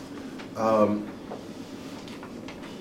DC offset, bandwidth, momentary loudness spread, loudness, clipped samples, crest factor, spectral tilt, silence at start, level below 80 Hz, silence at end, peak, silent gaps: under 0.1%; 15.5 kHz; 17 LU; -30 LUFS; under 0.1%; 20 dB; -6.5 dB/octave; 0 s; -60 dBFS; 0 s; -10 dBFS; none